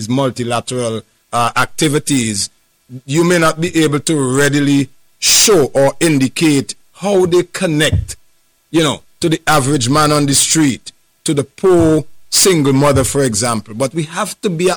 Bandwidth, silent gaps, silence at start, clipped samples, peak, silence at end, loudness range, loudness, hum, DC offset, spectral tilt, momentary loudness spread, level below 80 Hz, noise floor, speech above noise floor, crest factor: over 20 kHz; none; 0 s; under 0.1%; -2 dBFS; 0 s; 3 LU; -13 LUFS; none; under 0.1%; -4 dB/octave; 9 LU; -38 dBFS; -55 dBFS; 42 dB; 12 dB